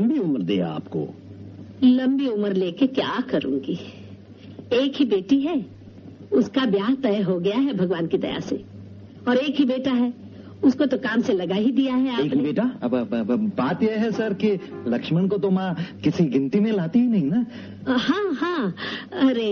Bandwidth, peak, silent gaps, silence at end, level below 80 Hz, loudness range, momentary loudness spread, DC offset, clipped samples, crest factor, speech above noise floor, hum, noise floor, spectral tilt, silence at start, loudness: 6.8 kHz; -6 dBFS; none; 0 s; -62 dBFS; 2 LU; 11 LU; under 0.1%; under 0.1%; 16 dB; 20 dB; none; -42 dBFS; -5.5 dB/octave; 0 s; -23 LUFS